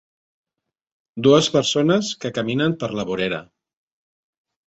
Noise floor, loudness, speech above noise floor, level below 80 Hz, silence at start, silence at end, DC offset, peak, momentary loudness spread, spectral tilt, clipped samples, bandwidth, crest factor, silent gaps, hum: -83 dBFS; -20 LUFS; 64 dB; -60 dBFS; 1.15 s; 1.25 s; under 0.1%; -2 dBFS; 10 LU; -5 dB/octave; under 0.1%; 8.2 kHz; 20 dB; none; none